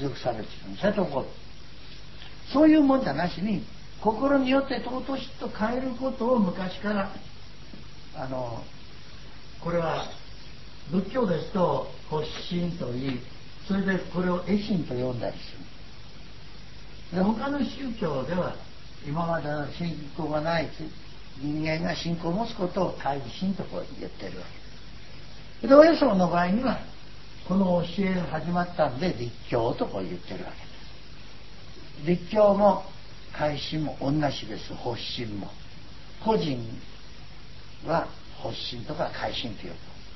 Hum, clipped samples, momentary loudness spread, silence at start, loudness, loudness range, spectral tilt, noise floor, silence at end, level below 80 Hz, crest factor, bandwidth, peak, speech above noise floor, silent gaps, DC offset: none; under 0.1%; 23 LU; 0 s; -27 LUFS; 9 LU; -7 dB/octave; -46 dBFS; 0 s; -48 dBFS; 26 dB; 6 kHz; -2 dBFS; 20 dB; none; 1%